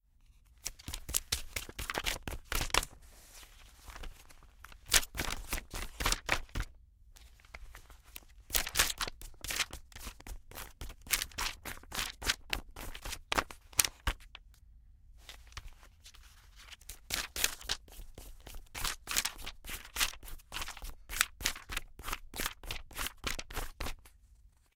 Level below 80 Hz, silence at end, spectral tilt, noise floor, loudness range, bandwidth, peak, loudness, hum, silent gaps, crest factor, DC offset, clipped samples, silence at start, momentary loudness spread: -46 dBFS; 0.25 s; -1 dB/octave; -63 dBFS; 5 LU; 18 kHz; -2 dBFS; -36 LUFS; none; none; 38 dB; under 0.1%; under 0.1%; 0.5 s; 22 LU